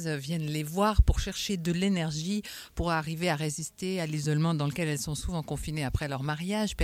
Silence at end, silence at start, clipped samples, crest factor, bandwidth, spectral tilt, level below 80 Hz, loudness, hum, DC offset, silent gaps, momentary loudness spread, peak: 0 s; 0 s; under 0.1%; 22 dB; 16.5 kHz; -5 dB/octave; -36 dBFS; -30 LUFS; none; under 0.1%; none; 7 LU; -8 dBFS